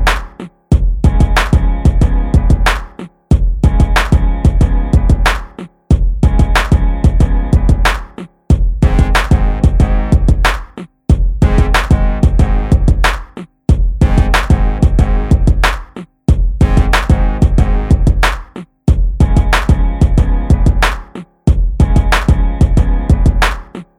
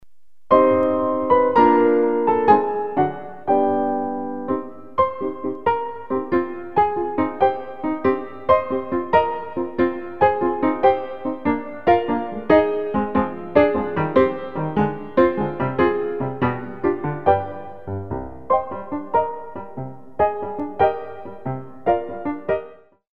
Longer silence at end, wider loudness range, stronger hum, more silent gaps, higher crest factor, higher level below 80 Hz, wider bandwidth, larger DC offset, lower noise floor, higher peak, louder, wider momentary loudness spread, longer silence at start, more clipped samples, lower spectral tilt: first, 0.15 s vs 0 s; second, 1 LU vs 6 LU; neither; neither; second, 10 dB vs 20 dB; first, -12 dBFS vs -50 dBFS; first, 12.5 kHz vs 5.6 kHz; second, under 0.1% vs 1%; second, -30 dBFS vs -52 dBFS; about the same, 0 dBFS vs 0 dBFS; first, -13 LUFS vs -21 LUFS; second, 9 LU vs 12 LU; about the same, 0 s vs 0 s; neither; second, -6.5 dB/octave vs -9.5 dB/octave